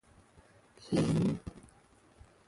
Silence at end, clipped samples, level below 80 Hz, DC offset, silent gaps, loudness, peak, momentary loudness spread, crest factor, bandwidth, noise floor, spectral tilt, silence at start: 0.9 s; under 0.1%; -58 dBFS; under 0.1%; none; -32 LUFS; -18 dBFS; 21 LU; 18 dB; 11.5 kHz; -63 dBFS; -7 dB/octave; 0.8 s